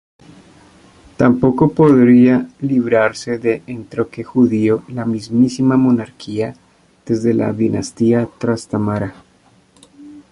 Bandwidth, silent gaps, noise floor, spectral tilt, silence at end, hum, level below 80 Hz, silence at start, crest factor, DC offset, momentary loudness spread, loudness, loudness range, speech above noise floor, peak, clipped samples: 11 kHz; none; -52 dBFS; -7.5 dB/octave; 0.1 s; none; -50 dBFS; 1.2 s; 14 dB; under 0.1%; 12 LU; -16 LUFS; 5 LU; 38 dB; -2 dBFS; under 0.1%